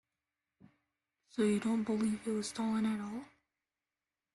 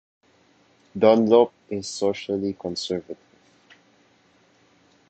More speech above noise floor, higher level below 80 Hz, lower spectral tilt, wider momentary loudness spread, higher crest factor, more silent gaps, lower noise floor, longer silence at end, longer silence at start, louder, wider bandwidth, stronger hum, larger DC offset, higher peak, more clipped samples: first, over 56 dB vs 38 dB; second, -74 dBFS vs -62 dBFS; about the same, -5.5 dB/octave vs -5.5 dB/octave; second, 11 LU vs 19 LU; second, 16 dB vs 22 dB; neither; first, under -90 dBFS vs -60 dBFS; second, 1.1 s vs 1.95 s; first, 1.35 s vs 0.95 s; second, -35 LUFS vs -22 LUFS; first, 12 kHz vs 8.8 kHz; neither; neither; second, -22 dBFS vs -2 dBFS; neither